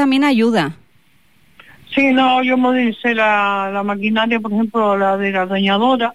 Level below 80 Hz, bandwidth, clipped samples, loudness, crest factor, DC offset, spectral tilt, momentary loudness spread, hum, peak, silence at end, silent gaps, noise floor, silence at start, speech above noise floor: -62 dBFS; 12 kHz; under 0.1%; -15 LUFS; 12 dB; 0.5%; -6 dB/octave; 6 LU; none; -4 dBFS; 0 s; none; -56 dBFS; 0 s; 41 dB